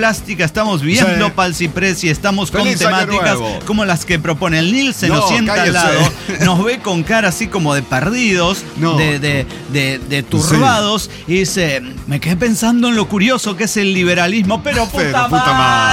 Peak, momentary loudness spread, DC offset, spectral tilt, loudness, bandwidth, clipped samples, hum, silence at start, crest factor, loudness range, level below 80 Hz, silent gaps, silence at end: -2 dBFS; 6 LU; under 0.1%; -4.5 dB/octave; -14 LUFS; 16.5 kHz; under 0.1%; none; 0 s; 12 dB; 2 LU; -36 dBFS; none; 0 s